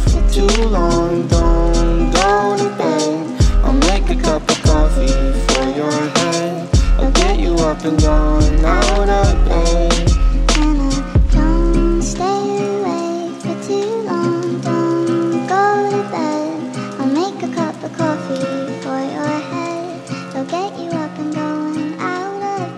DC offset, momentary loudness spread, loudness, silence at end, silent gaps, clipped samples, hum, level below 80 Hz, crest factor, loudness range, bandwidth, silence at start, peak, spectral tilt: under 0.1%; 8 LU; -17 LUFS; 0 s; none; under 0.1%; none; -18 dBFS; 14 dB; 7 LU; 11 kHz; 0 s; 0 dBFS; -5.5 dB/octave